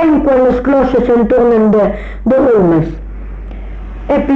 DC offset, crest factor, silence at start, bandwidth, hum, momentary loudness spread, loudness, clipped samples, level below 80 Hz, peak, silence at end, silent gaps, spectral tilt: under 0.1%; 8 dB; 0 s; 6.8 kHz; none; 19 LU; -11 LUFS; under 0.1%; -26 dBFS; -2 dBFS; 0 s; none; -9.5 dB/octave